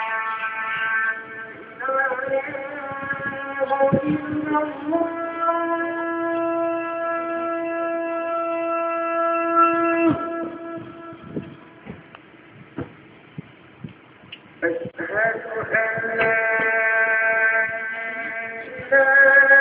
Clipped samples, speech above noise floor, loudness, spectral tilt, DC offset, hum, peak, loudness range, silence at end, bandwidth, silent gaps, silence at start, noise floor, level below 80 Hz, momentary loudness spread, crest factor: under 0.1%; 25 dB; -21 LUFS; -9 dB/octave; under 0.1%; none; -4 dBFS; 14 LU; 0 s; 4 kHz; none; 0 s; -46 dBFS; -60 dBFS; 20 LU; 20 dB